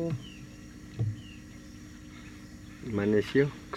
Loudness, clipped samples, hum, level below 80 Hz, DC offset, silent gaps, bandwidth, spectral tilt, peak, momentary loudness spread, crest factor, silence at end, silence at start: -31 LUFS; under 0.1%; none; -54 dBFS; under 0.1%; none; 14 kHz; -7 dB/octave; -12 dBFS; 20 LU; 20 dB; 0 s; 0 s